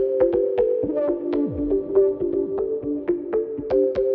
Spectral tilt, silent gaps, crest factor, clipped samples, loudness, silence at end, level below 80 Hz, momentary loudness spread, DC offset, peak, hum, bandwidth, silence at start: -10.5 dB/octave; none; 16 dB; under 0.1%; -22 LUFS; 0 s; -46 dBFS; 6 LU; under 0.1%; -6 dBFS; none; 4.9 kHz; 0 s